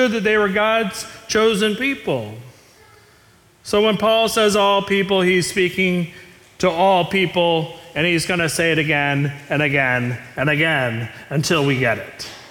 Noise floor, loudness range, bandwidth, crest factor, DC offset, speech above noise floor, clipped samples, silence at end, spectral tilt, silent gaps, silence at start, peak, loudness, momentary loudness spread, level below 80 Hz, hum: -52 dBFS; 3 LU; 18 kHz; 14 dB; under 0.1%; 34 dB; under 0.1%; 0 s; -4.5 dB/octave; none; 0 s; -6 dBFS; -18 LUFS; 10 LU; -52 dBFS; none